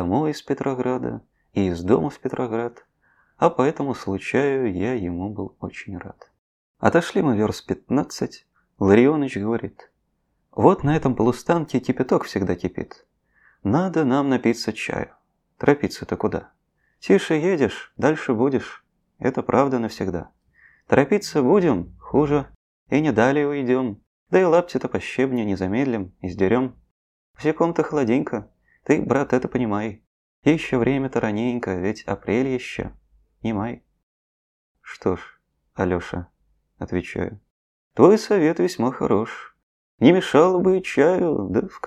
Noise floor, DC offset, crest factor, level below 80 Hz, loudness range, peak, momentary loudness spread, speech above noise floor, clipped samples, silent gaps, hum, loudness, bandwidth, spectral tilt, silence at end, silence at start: -71 dBFS; under 0.1%; 22 dB; -52 dBFS; 6 LU; 0 dBFS; 14 LU; 50 dB; under 0.1%; 6.38-6.74 s, 22.56-22.86 s, 24.07-24.26 s, 26.91-27.34 s, 30.07-30.42 s, 34.03-34.75 s, 37.50-37.91 s, 39.63-39.98 s; none; -22 LUFS; 13 kHz; -7 dB/octave; 0 s; 0 s